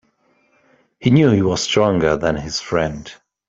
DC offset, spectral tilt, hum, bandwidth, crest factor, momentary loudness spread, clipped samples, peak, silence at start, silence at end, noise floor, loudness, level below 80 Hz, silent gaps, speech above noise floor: under 0.1%; -5.5 dB/octave; none; 8 kHz; 16 dB; 11 LU; under 0.1%; -2 dBFS; 1 s; 0.35 s; -61 dBFS; -17 LUFS; -44 dBFS; none; 44 dB